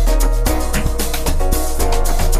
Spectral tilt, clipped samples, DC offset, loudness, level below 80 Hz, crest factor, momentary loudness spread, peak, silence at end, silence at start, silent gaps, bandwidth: -4.5 dB/octave; under 0.1%; under 0.1%; -19 LUFS; -14 dBFS; 12 dB; 2 LU; -2 dBFS; 0 s; 0 s; none; 15.5 kHz